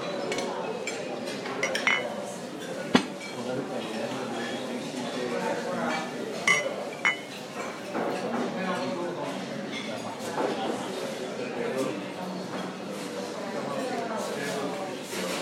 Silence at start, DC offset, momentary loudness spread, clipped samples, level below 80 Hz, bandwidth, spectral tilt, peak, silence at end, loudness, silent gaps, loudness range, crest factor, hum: 0 s; under 0.1%; 9 LU; under 0.1%; -76 dBFS; 16 kHz; -3.5 dB/octave; -6 dBFS; 0 s; -31 LUFS; none; 4 LU; 26 dB; none